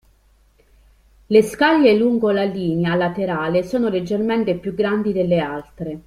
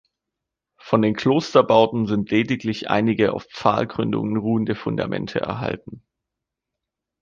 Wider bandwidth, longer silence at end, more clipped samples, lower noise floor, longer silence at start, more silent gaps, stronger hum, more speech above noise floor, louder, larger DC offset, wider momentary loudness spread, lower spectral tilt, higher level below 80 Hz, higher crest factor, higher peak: first, 15 kHz vs 7.4 kHz; second, 0.05 s vs 1.25 s; neither; second, -56 dBFS vs -84 dBFS; first, 1.3 s vs 0.85 s; neither; neither; second, 38 dB vs 63 dB; about the same, -19 LUFS vs -21 LUFS; neither; about the same, 7 LU vs 8 LU; about the same, -7 dB/octave vs -7 dB/octave; about the same, -50 dBFS vs -54 dBFS; about the same, 18 dB vs 20 dB; about the same, -2 dBFS vs -2 dBFS